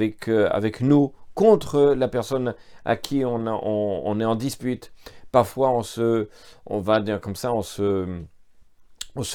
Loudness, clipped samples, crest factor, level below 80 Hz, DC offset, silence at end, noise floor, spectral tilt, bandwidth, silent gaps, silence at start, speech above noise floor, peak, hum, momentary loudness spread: -23 LUFS; under 0.1%; 20 dB; -52 dBFS; under 0.1%; 0 s; -50 dBFS; -6.5 dB/octave; 18.5 kHz; none; 0 s; 27 dB; -2 dBFS; none; 12 LU